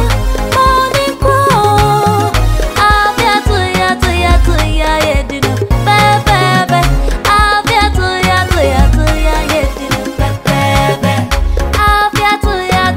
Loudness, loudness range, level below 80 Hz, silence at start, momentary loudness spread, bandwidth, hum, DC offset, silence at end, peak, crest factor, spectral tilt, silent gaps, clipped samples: -11 LUFS; 2 LU; -16 dBFS; 0 s; 5 LU; 16.5 kHz; none; 0.1%; 0 s; 0 dBFS; 10 dB; -5 dB/octave; none; under 0.1%